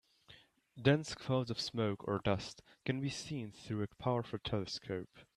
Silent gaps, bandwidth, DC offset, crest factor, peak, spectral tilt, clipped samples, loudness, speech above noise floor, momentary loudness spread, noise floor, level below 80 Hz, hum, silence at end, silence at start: none; 12 kHz; under 0.1%; 22 dB; -16 dBFS; -6 dB/octave; under 0.1%; -38 LUFS; 26 dB; 11 LU; -63 dBFS; -64 dBFS; none; 0.15 s; 0.3 s